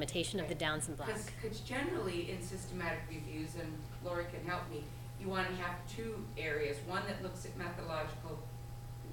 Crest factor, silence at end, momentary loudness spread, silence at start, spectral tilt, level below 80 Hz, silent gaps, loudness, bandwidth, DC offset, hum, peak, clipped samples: 20 dB; 0 s; 9 LU; 0 s; -4.5 dB/octave; -54 dBFS; none; -41 LUFS; 17 kHz; under 0.1%; none; -20 dBFS; under 0.1%